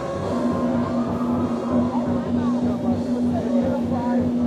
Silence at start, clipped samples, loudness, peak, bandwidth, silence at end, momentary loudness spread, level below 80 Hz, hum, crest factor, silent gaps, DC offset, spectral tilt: 0 s; under 0.1%; -22 LUFS; -10 dBFS; 9 kHz; 0 s; 2 LU; -46 dBFS; none; 12 dB; none; under 0.1%; -8 dB/octave